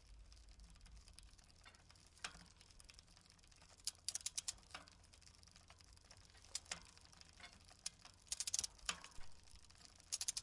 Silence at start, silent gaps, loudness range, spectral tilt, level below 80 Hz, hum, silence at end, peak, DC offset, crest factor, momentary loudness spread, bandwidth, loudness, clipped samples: 0 s; none; 12 LU; 0.5 dB/octave; -68 dBFS; none; 0 s; -20 dBFS; under 0.1%; 32 dB; 21 LU; 11.5 kHz; -47 LUFS; under 0.1%